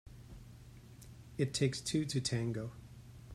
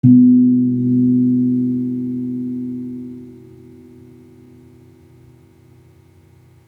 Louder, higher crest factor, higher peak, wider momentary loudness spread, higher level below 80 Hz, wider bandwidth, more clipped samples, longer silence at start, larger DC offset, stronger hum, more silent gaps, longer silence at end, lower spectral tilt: second, -36 LUFS vs -16 LUFS; about the same, 20 dB vs 16 dB; second, -20 dBFS vs -2 dBFS; about the same, 22 LU vs 21 LU; about the same, -60 dBFS vs -62 dBFS; first, 15 kHz vs 1 kHz; neither; about the same, 0.05 s vs 0.05 s; neither; neither; neither; second, 0 s vs 3.3 s; second, -5 dB/octave vs -12.5 dB/octave